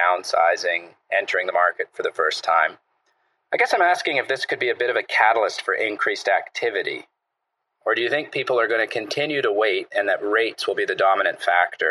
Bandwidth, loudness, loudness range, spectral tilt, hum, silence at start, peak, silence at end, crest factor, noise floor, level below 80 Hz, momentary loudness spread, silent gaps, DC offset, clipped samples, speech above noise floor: 12.5 kHz; -21 LUFS; 3 LU; -2.5 dB/octave; none; 0 s; -2 dBFS; 0 s; 20 dB; -79 dBFS; -86 dBFS; 6 LU; none; under 0.1%; under 0.1%; 57 dB